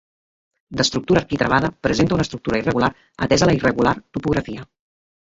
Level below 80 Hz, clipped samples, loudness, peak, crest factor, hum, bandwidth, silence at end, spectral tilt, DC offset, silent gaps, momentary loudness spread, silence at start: -42 dBFS; under 0.1%; -19 LUFS; -2 dBFS; 18 dB; none; 7.8 kHz; 0.75 s; -5 dB/octave; under 0.1%; none; 8 LU; 0.7 s